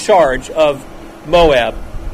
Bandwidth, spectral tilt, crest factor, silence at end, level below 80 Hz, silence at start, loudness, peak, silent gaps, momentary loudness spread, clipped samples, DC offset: 15 kHz; -4.5 dB/octave; 14 dB; 0 s; -28 dBFS; 0 s; -13 LUFS; 0 dBFS; none; 20 LU; under 0.1%; under 0.1%